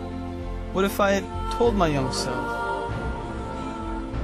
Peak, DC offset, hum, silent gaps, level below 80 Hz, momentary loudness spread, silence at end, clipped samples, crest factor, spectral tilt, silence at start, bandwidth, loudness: -8 dBFS; under 0.1%; none; none; -36 dBFS; 11 LU; 0 s; under 0.1%; 18 dB; -5.5 dB/octave; 0 s; 15.5 kHz; -26 LUFS